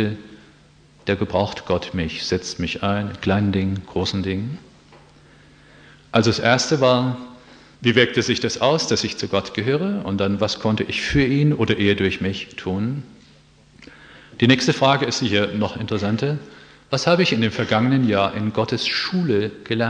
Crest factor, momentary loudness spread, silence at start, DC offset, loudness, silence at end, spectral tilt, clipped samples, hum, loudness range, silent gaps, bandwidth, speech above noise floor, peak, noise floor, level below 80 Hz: 20 dB; 9 LU; 0 s; under 0.1%; -20 LUFS; 0 s; -5 dB/octave; under 0.1%; none; 4 LU; none; 10 kHz; 31 dB; 0 dBFS; -51 dBFS; -48 dBFS